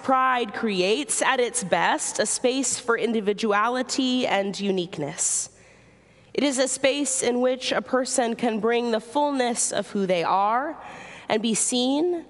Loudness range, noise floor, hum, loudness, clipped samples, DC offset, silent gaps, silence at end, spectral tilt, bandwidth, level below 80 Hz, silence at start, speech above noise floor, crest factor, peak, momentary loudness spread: 2 LU; -54 dBFS; none; -23 LUFS; under 0.1%; under 0.1%; none; 0.05 s; -2.5 dB/octave; 11.5 kHz; -66 dBFS; 0 s; 30 dB; 18 dB; -6 dBFS; 5 LU